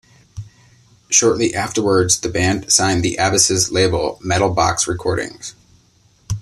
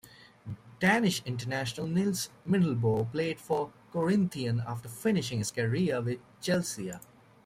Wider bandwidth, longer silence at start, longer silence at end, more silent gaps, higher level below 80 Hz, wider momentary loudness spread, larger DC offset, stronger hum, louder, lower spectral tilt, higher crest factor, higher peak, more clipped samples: second, 13.5 kHz vs 16 kHz; first, 0.35 s vs 0.05 s; second, 0 s vs 0.45 s; neither; first, -42 dBFS vs -64 dBFS; first, 15 LU vs 11 LU; neither; neither; first, -16 LUFS vs -30 LUFS; second, -3 dB/octave vs -5.5 dB/octave; about the same, 18 dB vs 18 dB; first, 0 dBFS vs -14 dBFS; neither